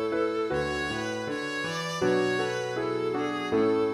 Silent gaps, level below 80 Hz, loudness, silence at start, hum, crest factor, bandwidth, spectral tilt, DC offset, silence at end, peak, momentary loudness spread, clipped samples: none; -56 dBFS; -28 LUFS; 0 s; none; 14 dB; 14 kHz; -5 dB/octave; under 0.1%; 0 s; -14 dBFS; 6 LU; under 0.1%